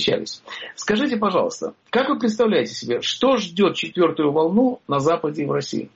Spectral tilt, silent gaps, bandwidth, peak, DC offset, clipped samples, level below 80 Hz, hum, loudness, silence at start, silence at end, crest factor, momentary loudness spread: -3.5 dB/octave; none; 8 kHz; -8 dBFS; under 0.1%; under 0.1%; -60 dBFS; none; -21 LUFS; 0 s; 0.1 s; 14 dB; 7 LU